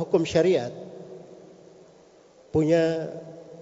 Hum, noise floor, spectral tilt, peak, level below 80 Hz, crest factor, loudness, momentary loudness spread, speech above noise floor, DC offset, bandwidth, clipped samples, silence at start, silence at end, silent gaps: none; -54 dBFS; -6.5 dB/octave; -8 dBFS; -60 dBFS; 18 dB; -24 LUFS; 22 LU; 31 dB; under 0.1%; 7.8 kHz; under 0.1%; 0 s; 0 s; none